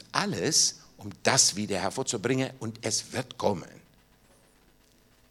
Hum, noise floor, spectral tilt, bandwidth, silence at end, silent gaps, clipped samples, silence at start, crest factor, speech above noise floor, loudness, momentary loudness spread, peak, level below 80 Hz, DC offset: none; -61 dBFS; -2.5 dB/octave; 17.5 kHz; 1.6 s; none; under 0.1%; 0.15 s; 26 dB; 33 dB; -27 LUFS; 14 LU; -4 dBFS; -66 dBFS; under 0.1%